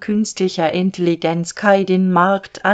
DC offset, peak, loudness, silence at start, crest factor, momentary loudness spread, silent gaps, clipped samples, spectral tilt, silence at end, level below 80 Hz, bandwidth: under 0.1%; 0 dBFS; -17 LUFS; 0 s; 16 dB; 5 LU; none; under 0.1%; -5.5 dB/octave; 0 s; -60 dBFS; 9 kHz